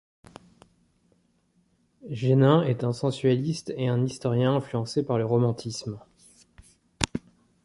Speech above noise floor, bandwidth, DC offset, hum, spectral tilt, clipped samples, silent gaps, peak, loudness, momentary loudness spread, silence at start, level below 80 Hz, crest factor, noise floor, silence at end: 43 dB; 11.5 kHz; under 0.1%; none; -6.5 dB/octave; under 0.1%; none; -2 dBFS; -25 LUFS; 14 LU; 2.05 s; -54 dBFS; 26 dB; -67 dBFS; 0.45 s